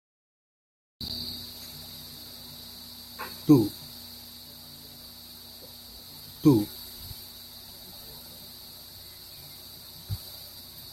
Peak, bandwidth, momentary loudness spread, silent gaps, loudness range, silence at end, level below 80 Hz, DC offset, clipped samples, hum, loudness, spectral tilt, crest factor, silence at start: -8 dBFS; 16.5 kHz; 21 LU; none; 12 LU; 0 s; -58 dBFS; under 0.1%; under 0.1%; none; -30 LUFS; -6 dB/octave; 24 dB; 1 s